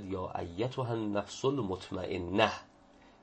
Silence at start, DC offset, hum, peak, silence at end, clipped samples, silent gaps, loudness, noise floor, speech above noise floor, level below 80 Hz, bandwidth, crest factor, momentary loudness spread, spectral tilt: 0 s; under 0.1%; none; -10 dBFS; 0.1 s; under 0.1%; none; -34 LUFS; -60 dBFS; 26 dB; -62 dBFS; 8.4 kHz; 24 dB; 9 LU; -5.5 dB/octave